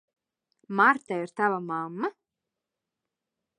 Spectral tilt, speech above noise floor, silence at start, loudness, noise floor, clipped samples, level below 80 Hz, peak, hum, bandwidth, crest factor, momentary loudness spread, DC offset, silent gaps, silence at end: -6.5 dB/octave; 61 dB; 0.7 s; -27 LUFS; -87 dBFS; under 0.1%; -86 dBFS; -8 dBFS; none; 10.5 kHz; 22 dB; 12 LU; under 0.1%; none; 1.5 s